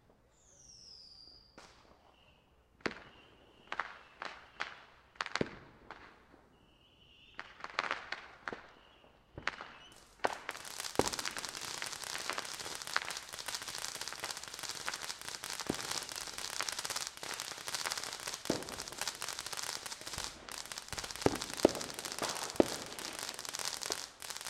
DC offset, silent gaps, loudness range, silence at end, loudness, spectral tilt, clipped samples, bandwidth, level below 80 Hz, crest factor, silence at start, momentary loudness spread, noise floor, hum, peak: under 0.1%; none; 10 LU; 0 s; -39 LUFS; -2 dB/octave; under 0.1%; 16.5 kHz; -66 dBFS; 34 dB; 0.45 s; 19 LU; -67 dBFS; none; -8 dBFS